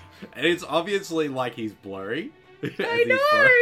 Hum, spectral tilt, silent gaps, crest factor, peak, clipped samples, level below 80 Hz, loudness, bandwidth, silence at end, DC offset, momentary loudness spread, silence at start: none; -4.5 dB/octave; none; 18 dB; -4 dBFS; under 0.1%; -70 dBFS; -23 LUFS; 15.5 kHz; 0 s; under 0.1%; 17 LU; 0.2 s